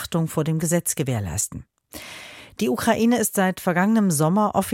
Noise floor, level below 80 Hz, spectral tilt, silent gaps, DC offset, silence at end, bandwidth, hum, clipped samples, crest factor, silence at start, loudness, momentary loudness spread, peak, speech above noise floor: -41 dBFS; -50 dBFS; -5 dB/octave; none; under 0.1%; 0 s; 17 kHz; none; under 0.1%; 14 dB; 0 s; -21 LUFS; 19 LU; -8 dBFS; 20 dB